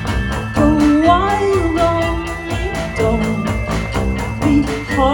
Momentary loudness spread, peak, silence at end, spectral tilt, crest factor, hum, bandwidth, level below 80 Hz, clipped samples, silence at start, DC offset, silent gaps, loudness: 9 LU; 0 dBFS; 0 s; -6.5 dB/octave; 16 dB; none; 18 kHz; -26 dBFS; under 0.1%; 0 s; under 0.1%; none; -16 LUFS